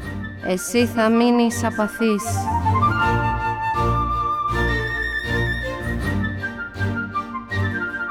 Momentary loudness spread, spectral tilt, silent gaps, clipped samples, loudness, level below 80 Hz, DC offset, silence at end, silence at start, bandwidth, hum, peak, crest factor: 8 LU; -5.5 dB/octave; none; under 0.1%; -21 LUFS; -34 dBFS; under 0.1%; 0 s; 0 s; 16.5 kHz; none; -4 dBFS; 16 dB